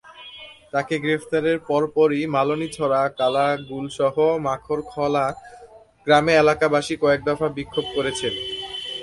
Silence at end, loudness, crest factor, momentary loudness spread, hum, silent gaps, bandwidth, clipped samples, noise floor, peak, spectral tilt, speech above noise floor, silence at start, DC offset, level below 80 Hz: 0 s; -21 LUFS; 18 dB; 11 LU; none; none; 11.5 kHz; under 0.1%; -42 dBFS; -4 dBFS; -5 dB/octave; 21 dB; 0.05 s; under 0.1%; -54 dBFS